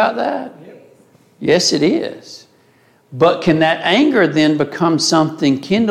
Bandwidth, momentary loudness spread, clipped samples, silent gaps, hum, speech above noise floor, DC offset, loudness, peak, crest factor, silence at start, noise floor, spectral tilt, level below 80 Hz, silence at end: 13.5 kHz; 13 LU; under 0.1%; none; none; 38 dB; under 0.1%; -15 LUFS; -2 dBFS; 14 dB; 0 s; -53 dBFS; -4.5 dB/octave; -56 dBFS; 0 s